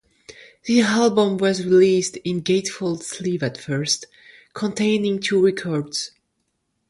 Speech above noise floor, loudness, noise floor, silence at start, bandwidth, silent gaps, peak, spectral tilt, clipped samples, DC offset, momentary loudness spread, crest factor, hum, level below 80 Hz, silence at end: 53 dB; -20 LUFS; -73 dBFS; 0.3 s; 11.5 kHz; none; -4 dBFS; -4.5 dB/octave; under 0.1%; under 0.1%; 11 LU; 16 dB; none; -62 dBFS; 0.8 s